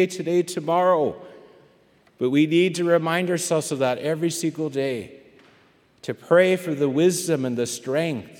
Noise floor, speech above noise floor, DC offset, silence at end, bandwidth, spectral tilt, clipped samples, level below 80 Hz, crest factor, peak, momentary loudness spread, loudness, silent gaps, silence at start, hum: -58 dBFS; 36 dB; under 0.1%; 0.05 s; 17.5 kHz; -5 dB/octave; under 0.1%; -72 dBFS; 18 dB; -4 dBFS; 9 LU; -22 LUFS; none; 0 s; none